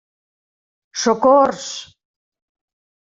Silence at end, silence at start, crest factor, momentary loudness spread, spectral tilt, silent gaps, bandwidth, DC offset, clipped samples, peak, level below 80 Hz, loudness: 1.35 s; 0.95 s; 18 dB; 17 LU; -3 dB/octave; none; 7.8 kHz; under 0.1%; under 0.1%; -2 dBFS; -62 dBFS; -15 LUFS